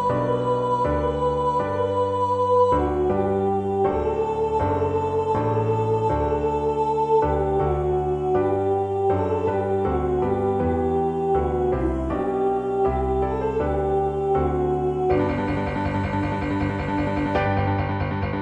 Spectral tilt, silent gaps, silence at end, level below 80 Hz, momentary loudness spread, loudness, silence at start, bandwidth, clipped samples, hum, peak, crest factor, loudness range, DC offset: -8.5 dB/octave; none; 0 s; -36 dBFS; 3 LU; -23 LUFS; 0 s; 9.2 kHz; under 0.1%; none; -8 dBFS; 14 dB; 2 LU; under 0.1%